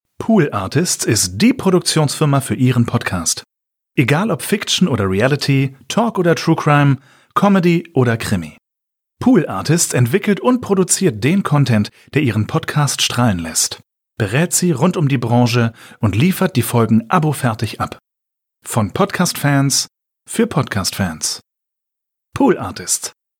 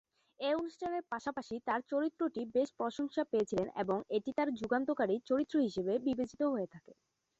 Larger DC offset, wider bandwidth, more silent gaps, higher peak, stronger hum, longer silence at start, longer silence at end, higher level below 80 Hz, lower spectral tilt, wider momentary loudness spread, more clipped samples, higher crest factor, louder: neither; first, 18 kHz vs 8 kHz; neither; first, -2 dBFS vs -20 dBFS; neither; second, 0.2 s vs 0.4 s; second, 0.3 s vs 0.45 s; first, -50 dBFS vs -72 dBFS; about the same, -5 dB/octave vs -6 dB/octave; about the same, 7 LU vs 6 LU; neither; about the same, 14 dB vs 16 dB; first, -16 LUFS vs -36 LUFS